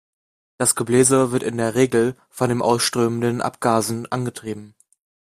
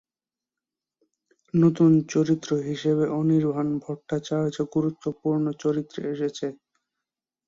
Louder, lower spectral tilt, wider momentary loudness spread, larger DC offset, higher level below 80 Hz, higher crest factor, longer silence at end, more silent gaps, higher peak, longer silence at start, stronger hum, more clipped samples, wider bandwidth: first, -20 LUFS vs -25 LUFS; second, -4.5 dB/octave vs -7.5 dB/octave; about the same, 10 LU vs 11 LU; neither; first, -58 dBFS vs -66 dBFS; about the same, 18 dB vs 18 dB; second, 0.7 s vs 0.9 s; neither; first, -2 dBFS vs -8 dBFS; second, 0.6 s vs 1.55 s; neither; neither; first, 15.5 kHz vs 7.6 kHz